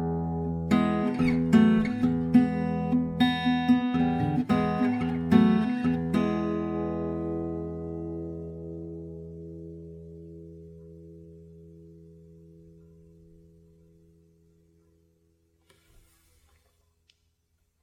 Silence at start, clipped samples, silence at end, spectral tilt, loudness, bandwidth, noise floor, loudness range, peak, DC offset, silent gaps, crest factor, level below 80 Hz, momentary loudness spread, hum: 0 s; under 0.1%; 5.7 s; -8 dB/octave; -26 LUFS; 9.8 kHz; -73 dBFS; 21 LU; -6 dBFS; under 0.1%; none; 22 dB; -50 dBFS; 23 LU; none